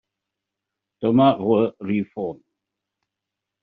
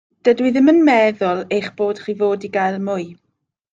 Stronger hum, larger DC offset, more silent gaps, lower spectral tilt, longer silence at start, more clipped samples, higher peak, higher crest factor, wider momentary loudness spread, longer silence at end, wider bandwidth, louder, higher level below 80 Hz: neither; neither; neither; about the same, -6.5 dB/octave vs -6.5 dB/octave; first, 1 s vs 0.25 s; neither; about the same, -4 dBFS vs -2 dBFS; about the same, 20 dB vs 16 dB; about the same, 13 LU vs 11 LU; first, 1.3 s vs 0.6 s; second, 4.6 kHz vs 7.8 kHz; second, -21 LUFS vs -17 LUFS; about the same, -64 dBFS vs -64 dBFS